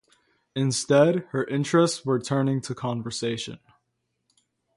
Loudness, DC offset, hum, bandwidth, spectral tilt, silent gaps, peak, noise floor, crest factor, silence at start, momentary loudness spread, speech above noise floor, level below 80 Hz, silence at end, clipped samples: -24 LUFS; under 0.1%; none; 11.5 kHz; -5.5 dB/octave; none; -6 dBFS; -77 dBFS; 20 dB; 0.55 s; 10 LU; 53 dB; -66 dBFS; 1.2 s; under 0.1%